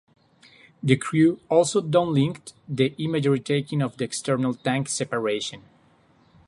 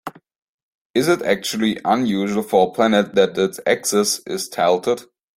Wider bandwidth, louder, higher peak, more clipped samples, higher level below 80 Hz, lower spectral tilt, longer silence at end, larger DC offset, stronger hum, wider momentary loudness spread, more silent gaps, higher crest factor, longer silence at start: second, 11.5 kHz vs 16.5 kHz; second, -24 LUFS vs -19 LUFS; about the same, -4 dBFS vs -2 dBFS; neither; about the same, -62 dBFS vs -60 dBFS; first, -5.5 dB/octave vs -4 dB/octave; first, 0.9 s vs 0.35 s; neither; neither; about the same, 8 LU vs 7 LU; second, none vs 0.38-0.94 s; about the same, 20 dB vs 18 dB; first, 0.85 s vs 0.05 s